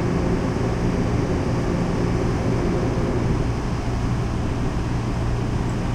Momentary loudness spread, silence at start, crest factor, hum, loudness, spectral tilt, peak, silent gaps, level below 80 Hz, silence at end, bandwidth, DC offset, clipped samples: 3 LU; 0 s; 12 dB; none; -23 LUFS; -7.5 dB/octave; -10 dBFS; none; -28 dBFS; 0 s; 10.5 kHz; under 0.1%; under 0.1%